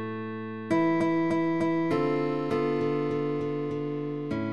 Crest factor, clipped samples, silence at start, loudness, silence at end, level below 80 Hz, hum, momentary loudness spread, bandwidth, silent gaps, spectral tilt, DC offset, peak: 14 dB; under 0.1%; 0 s; -28 LUFS; 0 s; -62 dBFS; none; 7 LU; 8.6 kHz; none; -8 dB/octave; 0.3%; -14 dBFS